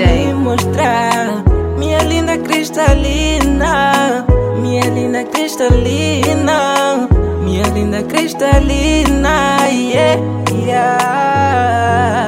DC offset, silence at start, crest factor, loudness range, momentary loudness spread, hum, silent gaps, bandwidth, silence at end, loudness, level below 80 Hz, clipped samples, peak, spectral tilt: under 0.1%; 0 s; 12 dB; 1 LU; 4 LU; none; none; 16.5 kHz; 0 s; -13 LUFS; -20 dBFS; under 0.1%; 0 dBFS; -5.5 dB/octave